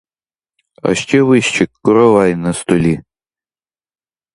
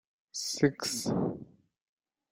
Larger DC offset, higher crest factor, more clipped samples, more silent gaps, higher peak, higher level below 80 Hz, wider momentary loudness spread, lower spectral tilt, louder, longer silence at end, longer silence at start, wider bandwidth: neither; second, 14 dB vs 22 dB; neither; neither; first, 0 dBFS vs -12 dBFS; first, -46 dBFS vs -66 dBFS; second, 8 LU vs 12 LU; first, -5.5 dB/octave vs -4 dB/octave; first, -13 LUFS vs -32 LUFS; first, 1.35 s vs 0.85 s; first, 0.85 s vs 0.35 s; second, 11 kHz vs 16 kHz